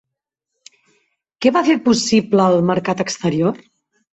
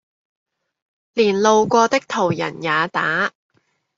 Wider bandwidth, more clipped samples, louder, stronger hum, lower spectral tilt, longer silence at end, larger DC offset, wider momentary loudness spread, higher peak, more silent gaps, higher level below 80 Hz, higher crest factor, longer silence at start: about the same, 8.2 kHz vs 7.6 kHz; neither; about the same, -16 LUFS vs -18 LUFS; neither; about the same, -5 dB/octave vs -4 dB/octave; second, 0.55 s vs 0.7 s; neither; about the same, 6 LU vs 8 LU; about the same, -2 dBFS vs -2 dBFS; neither; first, -56 dBFS vs -64 dBFS; about the same, 16 dB vs 18 dB; first, 1.4 s vs 1.15 s